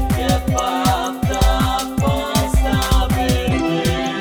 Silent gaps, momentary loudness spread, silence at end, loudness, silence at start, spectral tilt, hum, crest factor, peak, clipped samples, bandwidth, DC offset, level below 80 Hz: none; 2 LU; 0 s; -18 LUFS; 0 s; -5 dB/octave; none; 14 dB; -4 dBFS; under 0.1%; over 20 kHz; under 0.1%; -22 dBFS